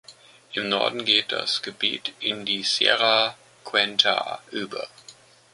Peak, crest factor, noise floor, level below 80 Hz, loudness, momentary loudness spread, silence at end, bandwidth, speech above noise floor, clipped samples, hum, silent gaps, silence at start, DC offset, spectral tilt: -2 dBFS; 24 dB; -51 dBFS; -72 dBFS; -22 LUFS; 14 LU; 0.4 s; 11.5 kHz; 26 dB; under 0.1%; none; none; 0.1 s; under 0.1%; -2 dB/octave